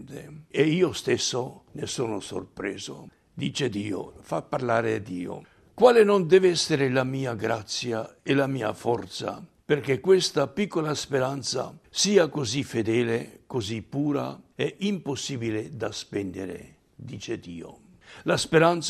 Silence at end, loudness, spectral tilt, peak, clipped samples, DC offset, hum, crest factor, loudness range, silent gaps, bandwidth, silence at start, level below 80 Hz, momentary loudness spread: 0 s; -26 LUFS; -4.5 dB/octave; -4 dBFS; under 0.1%; under 0.1%; none; 22 dB; 9 LU; none; 13 kHz; 0 s; -62 dBFS; 16 LU